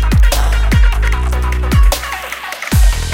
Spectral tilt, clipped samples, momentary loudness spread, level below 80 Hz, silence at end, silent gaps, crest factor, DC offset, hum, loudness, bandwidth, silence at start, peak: -4.5 dB/octave; under 0.1%; 9 LU; -12 dBFS; 0 s; none; 12 dB; under 0.1%; none; -15 LUFS; 16.5 kHz; 0 s; 0 dBFS